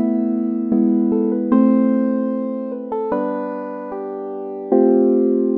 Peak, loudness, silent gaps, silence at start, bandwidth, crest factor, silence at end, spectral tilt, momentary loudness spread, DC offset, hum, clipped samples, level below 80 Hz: -2 dBFS; -19 LUFS; none; 0 s; 3.1 kHz; 16 dB; 0 s; -12 dB/octave; 13 LU; under 0.1%; none; under 0.1%; -62 dBFS